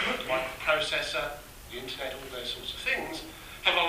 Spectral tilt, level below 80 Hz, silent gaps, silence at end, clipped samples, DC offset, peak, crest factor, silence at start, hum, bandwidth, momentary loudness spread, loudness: -2 dB/octave; -52 dBFS; none; 0 s; under 0.1%; under 0.1%; -8 dBFS; 24 dB; 0 s; none; 15.5 kHz; 13 LU; -31 LUFS